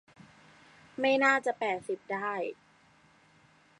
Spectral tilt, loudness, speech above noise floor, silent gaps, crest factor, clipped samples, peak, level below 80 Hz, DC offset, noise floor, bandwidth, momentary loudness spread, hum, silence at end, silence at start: -4 dB/octave; -30 LUFS; 33 dB; none; 20 dB; under 0.1%; -14 dBFS; -78 dBFS; under 0.1%; -63 dBFS; 11 kHz; 13 LU; none; 1.25 s; 1 s